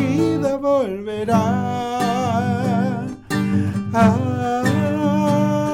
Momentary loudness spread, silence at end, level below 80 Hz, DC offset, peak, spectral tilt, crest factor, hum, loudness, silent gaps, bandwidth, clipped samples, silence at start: 6 LU; 0 s; -50 dBFS; under 0.1%; -6 dBFS; -7 dB/octave; 12 dB; none; -19 LUFS; none; 15.5 kHz; under 0.1%; 0 s